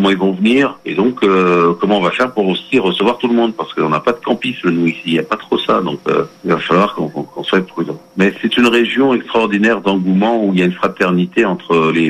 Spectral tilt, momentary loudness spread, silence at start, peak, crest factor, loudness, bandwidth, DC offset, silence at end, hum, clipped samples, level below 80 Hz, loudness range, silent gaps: -6.5 dB/octave; 5 LU; 0 s; -2 dBFS; 12 dB; -14 LUFS; 12.5 kHz; under 0.1%; 0 s; none; under 0.1%; -54 dBFS; 3 LU; none